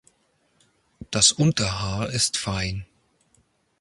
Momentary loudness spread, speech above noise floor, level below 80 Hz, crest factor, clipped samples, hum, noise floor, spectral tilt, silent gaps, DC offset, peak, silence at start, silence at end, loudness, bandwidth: 13 LU; 44 dB; -46 dBFS; 24 dB; under 0.1%; none; -67 dBFS; -3 dB/octave; none; under 0.1%; -2 dBFS; 1 s; 0.95 s; -22 LUFS; 11.5 kHz